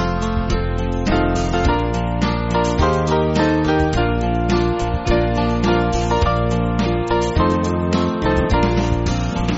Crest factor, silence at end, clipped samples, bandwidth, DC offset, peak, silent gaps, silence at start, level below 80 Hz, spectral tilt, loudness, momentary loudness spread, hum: 14 dB; 0 s; under 0.1%; 8 kHz; 0.1%; -2 dBFS; none; 0 s; -24 dBFS; -6 dB/octave; -18 LUFS; 4 LU; none